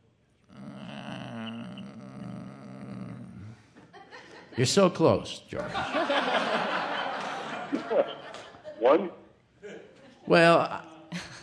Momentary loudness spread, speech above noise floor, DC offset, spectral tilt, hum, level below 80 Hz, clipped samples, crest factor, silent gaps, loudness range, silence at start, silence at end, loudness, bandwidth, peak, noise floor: 23 LU; 41 dB; under 0.1%; -5 dB/octave; none; -66 dBFS; under 0.1%; 22 dB; none; 15 LU; 0.5 s; 0 s; -27 LUFS; 11 kHz; -8 dBFS; -65 dBFS